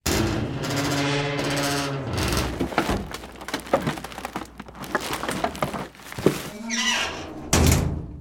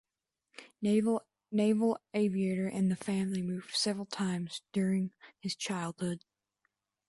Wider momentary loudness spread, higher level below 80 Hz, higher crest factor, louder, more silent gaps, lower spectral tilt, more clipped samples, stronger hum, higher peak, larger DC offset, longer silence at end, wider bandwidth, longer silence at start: first, 13 LU vs 9 LU; first, -36 dBFS vs -74 dBFS; first, 22 dB vs 16 dB; first, -25 LUFS vs -33 LUFS; neither; second, -4 dB/octave vs -5.5 dB/octave; neither; neither; first, -4 dBFS vs -18 dBFS; neither; second, 0 s vs 0.9 s; first, 17.5 kHz vs 11.5 kHz; second, 0.05 s vs 0.6 s